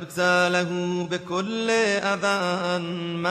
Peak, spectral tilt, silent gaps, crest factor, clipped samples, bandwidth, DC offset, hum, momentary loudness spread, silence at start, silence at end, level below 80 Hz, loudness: -8 dBFS; -4.5 dB/octave; none; 16 dB; under 0.1%; 13 kHz; under 0.1%; none; 7 LU; 0 s; 0 s; -66 dBFS; -24 LUFS